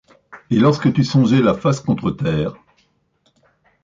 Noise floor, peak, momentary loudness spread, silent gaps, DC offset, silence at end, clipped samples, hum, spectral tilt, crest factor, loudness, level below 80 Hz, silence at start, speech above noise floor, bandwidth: -63 dBFS; -4 dBFS; 7 LU; none; under 0.1%; 1.3 s; under 0.1%; none; -7.5 dB/octave; 16 dB; -17 LUFS; -48 dBFS; 0.3 s; 47 dB; 7.6 kHz